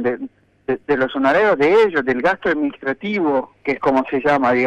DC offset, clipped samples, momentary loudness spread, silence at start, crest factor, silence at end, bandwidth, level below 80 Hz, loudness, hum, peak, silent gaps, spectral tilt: under 0.1%; under 0.1%; 11 LU; 0 s; 14 dB; 0 s; 8.6 kHz; -54 dBFS; -18 LUFS; none; -4 dBFS; none; -6.5 dB/octave